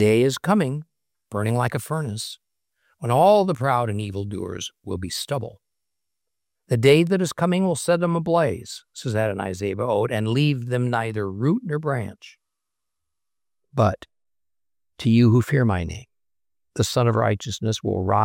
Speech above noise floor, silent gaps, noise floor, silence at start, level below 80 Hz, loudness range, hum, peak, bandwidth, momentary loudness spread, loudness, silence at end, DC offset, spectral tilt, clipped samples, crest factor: over 69 dB; none; under -90 dBFS; 0 s; -56 dBFS; 6 LU; none; -4 dBFS; 16.5 kHz; 15 LU; -22 LUFS; 0 s; under 0.1%; -6 dB/octave; under 0.1%; 18 dB